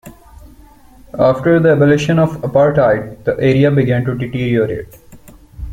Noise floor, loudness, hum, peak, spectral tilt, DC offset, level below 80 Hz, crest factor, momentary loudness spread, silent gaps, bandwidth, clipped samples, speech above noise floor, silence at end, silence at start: -42 dBFS; -14 LUFS; none; -2 dBFS; -8 dB/octave; under 0.1%; -38 dBFS; 14 dB; 9 LU; none; 15.5 kHz; under 0.1%; 29 dB; 0 s; 0.05 s